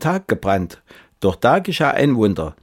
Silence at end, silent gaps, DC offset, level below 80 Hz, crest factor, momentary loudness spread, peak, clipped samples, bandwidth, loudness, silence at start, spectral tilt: 0.1 s; none; under 0.1%; -44 dBFS; 16 dB; 6 LU; -4 dBFS; under 0.1%; 16.5 kHz; -18 LUFS; 0 s; -6.5 dB/octave